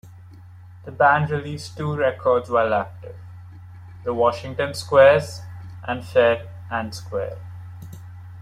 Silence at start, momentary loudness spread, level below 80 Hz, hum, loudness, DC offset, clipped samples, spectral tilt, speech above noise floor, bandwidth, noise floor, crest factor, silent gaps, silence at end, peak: 0.05 s; 24 LU; -56 dBFS; none; -21 LUFS; under 0.1%; under 0.1%; -6 dB/octave; 23 dB; 13.5 kHz; -43 dBFS; 20 dB; none; 0 s; -2 dBFS